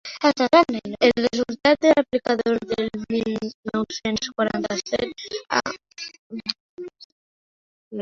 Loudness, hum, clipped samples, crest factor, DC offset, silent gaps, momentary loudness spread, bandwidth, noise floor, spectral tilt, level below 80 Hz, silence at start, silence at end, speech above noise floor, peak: -22 LUFS; none; under 0.1%; 20 dB; under 0.1%; 3.54-3.63 s, 6.19-6.30 s, 6.60-6.77 s, 7.04-7.91 s; 17 LU; 7.6 kHz; under -90 dBFS; -4 dB/octave; -56 dBFS; 0.05 s; 0 s; over 68 dB; -2 dBFS